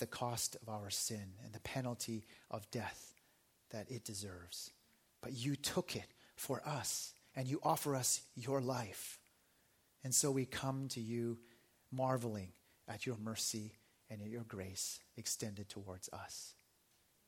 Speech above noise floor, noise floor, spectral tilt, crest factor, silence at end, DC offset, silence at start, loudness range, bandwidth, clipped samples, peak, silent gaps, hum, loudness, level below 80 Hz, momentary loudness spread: 32 dB; -75 dBFS; -3.5 dB/octave; 22 dB; 0.75 s; under 0.1%; 0 s; 7 LU; 17 kHz; under 0.1%; -22 dBFS; none; none; -42 LUFS; -76 dBFS; 15 LU